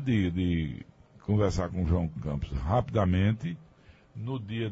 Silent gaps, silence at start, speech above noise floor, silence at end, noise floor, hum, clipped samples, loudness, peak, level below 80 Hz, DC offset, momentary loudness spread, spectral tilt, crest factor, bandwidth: none; 0 s; 29 dB; 0 s; -57 dBFS; none; under 0.1%; -29 LUFS; -14 dBFS; -42 dBFS; under 0.1%; 14 LU; -8 dB/octave; 16 dB; 8 kHz